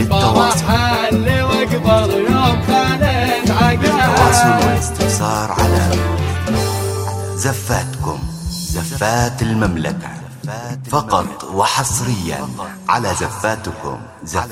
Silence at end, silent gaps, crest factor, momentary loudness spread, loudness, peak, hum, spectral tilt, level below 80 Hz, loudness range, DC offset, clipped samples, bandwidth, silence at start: 0 s; none; 16 dB; 12 LU; -16 LUFS; 0 dBFS; none; -5 dB/octave; -30 dBFS; 6 LU; under 0.1%; under 0.1%; 16 kHz; 0 s